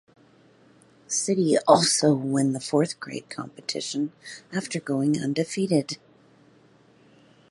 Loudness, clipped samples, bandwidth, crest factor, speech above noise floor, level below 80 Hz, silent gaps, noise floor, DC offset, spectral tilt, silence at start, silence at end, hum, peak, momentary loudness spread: -24 LUFS; under 0.1%; 11.5 kHz; 24 dB; 33 dB; -70 dBFS; none; -57 dBFS; under 0.1%; -4.5 dB/octave; 1.1 s; 1.55 s; none; -2 dBFS; 16 LU